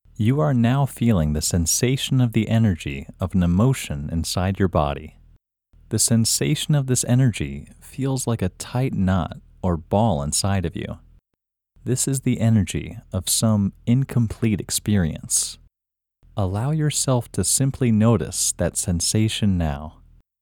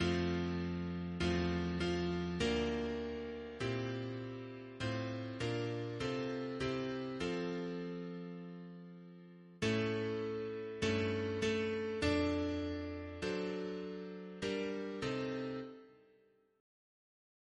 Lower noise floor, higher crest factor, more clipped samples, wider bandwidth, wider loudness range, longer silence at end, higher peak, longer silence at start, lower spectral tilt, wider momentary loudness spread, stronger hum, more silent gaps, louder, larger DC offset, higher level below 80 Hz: first, -85 dBFS vs -70 dBFS; about the same, 18 dB vs 18 dB; neither; first, 18.5 kHz vs 11 kHz; about the same, 3 LU vs 5 LU; second, 0.5 s vs 1.65 s; first, -4 dBFS vs -22 dBFS; first, 0.2 s vs 0 s; about the same, -5 dB/octave vs -6 dB/octave; about the same, 10 LU vs 12 LU; neither; neither; first, -21 LUFS vs -39 LUFS; neither; first, -40 dBFS vs -56 dBFS